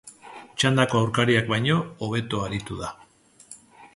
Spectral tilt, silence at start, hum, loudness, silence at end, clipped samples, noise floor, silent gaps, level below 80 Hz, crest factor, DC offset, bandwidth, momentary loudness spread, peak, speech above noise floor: -5 dB/octave; 0.05 s; none; -24 LUFS; 0.1 s; under 0.1%; -55 dBFS; none; -52 dBFS; 22 dB; under 0.1%; 11.5 kHz; 22 LU; -2 dBFS; 32 dB